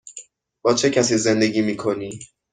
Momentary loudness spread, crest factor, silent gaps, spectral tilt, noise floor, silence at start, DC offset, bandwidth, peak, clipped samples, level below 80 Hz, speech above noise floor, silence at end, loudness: 20 LU; 18 dB; none; -4 dB/octave; -44 dBFS; 0.05 s; under 0.1%; 9.6 kHz; -4 dBFS; under 0.1%; -58 dBFS; 24 dB; 0.3 s; -20 LUFS